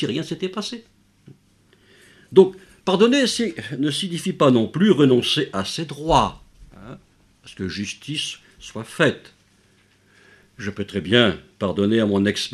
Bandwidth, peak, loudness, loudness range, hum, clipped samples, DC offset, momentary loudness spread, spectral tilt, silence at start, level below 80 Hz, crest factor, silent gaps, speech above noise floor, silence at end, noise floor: 13 kHz; 0 dBFS; -20 LUFS; 9 LU; none; under 0.1%; under 0.1%; 16 LU; -5 dB/octave; 0 s; -48 dBFS; 22 dB; none; 38 dB; 0 s; -58 dBFS